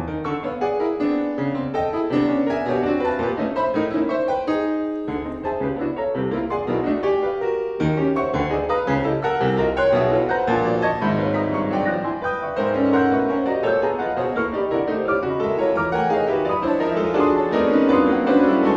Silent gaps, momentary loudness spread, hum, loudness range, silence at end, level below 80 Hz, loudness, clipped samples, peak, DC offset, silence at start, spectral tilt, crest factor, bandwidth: none; 7 LU; none; 3 LU; 0 s; -46 dBFS; -21 LUFS; under 0.1%; -4 dBFS; under 0.1%; 0 s; -8 dB/octave; 16 dB; 7.4 kHz